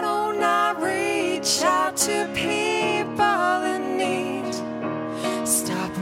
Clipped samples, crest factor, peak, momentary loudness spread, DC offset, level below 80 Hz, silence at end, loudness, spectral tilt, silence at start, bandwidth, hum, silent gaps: under 0.1%; 18 dB; -4 dBFS; 7 LU; under 0.1%; -60 dBFS; 0 s; -23 LUFS; -2.5 dB/octave; 0 s; 16.5 kHz; none; none